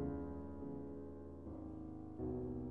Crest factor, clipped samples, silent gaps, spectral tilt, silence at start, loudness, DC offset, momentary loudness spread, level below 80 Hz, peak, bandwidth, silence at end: 16 dB; under 0.1%; none; -11.5 dB/octave; 0 s; -48 LUFS; under 0.1%; 7 LU; -58 dBFS; -30 dBFS; 3.6 kHz; 0 s